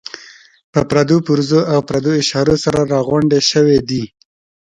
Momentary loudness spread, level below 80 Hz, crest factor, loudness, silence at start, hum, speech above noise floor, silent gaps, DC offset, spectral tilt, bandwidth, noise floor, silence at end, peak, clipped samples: 10 LU; -44 dBFS; 14 dB; -14 LUFS; 0.15 s; none; 24 dB; 0.64-0.73 s; under 0.1%; -5.5 dB/octave; 11 kHz; -37 dBFS; 0.6 s; 0 dBFS; under 0.1%